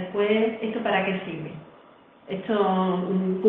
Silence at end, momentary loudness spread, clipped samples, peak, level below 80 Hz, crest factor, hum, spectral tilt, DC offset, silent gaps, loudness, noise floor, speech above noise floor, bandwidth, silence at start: 0 s; 13 LU; under 0.1%; -8 dBFS; -68 dBFS; 18 dB; none; -10 dB/octave; under 0.1%; none; -25 LUFS; -52 dBFS; 28 dB; 4.1 kHz; 0 s